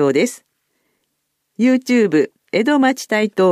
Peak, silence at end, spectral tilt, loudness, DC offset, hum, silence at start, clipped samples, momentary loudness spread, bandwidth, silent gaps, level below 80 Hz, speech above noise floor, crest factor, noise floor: -4 dBFS; 0 s; -5 dB/octave; -16 LUFS; under 0.1%; none; 0 s; under 0.1%; 6 LU; 14.5 kHz; none; -70 dBFS; 57 dB; 12 dB; -72 dBFS